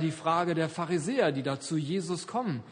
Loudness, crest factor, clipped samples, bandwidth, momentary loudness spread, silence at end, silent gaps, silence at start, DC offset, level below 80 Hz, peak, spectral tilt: -30 LUFS; 18 dB; under 0.1%; 10 kHz; 5 LU; 0 s; none; 0 s; under 0.1%; -72 dBFS; -12 dBFS; -5.5 dB/octave